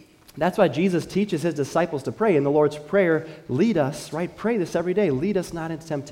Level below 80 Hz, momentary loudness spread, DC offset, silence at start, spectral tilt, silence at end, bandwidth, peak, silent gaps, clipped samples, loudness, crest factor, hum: -56 dBFS; 9 LU; under 0.1%; 0.35 s; -6.5 dB/octave; 0 s; 16 kHz; -6 dBFS; none; under 0.1%; -23 LUFS; 16 dB; none